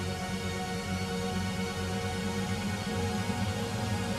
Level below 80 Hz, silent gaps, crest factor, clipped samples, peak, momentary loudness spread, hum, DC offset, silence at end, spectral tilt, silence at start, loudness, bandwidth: -50 dBFS; none; 14 dB; under 0.1%; -18 dBFS; 2 LU; none; under 0.1%; 0 s; -5 dB/octave; 0 s; -33 LUFS; 15.5 kHz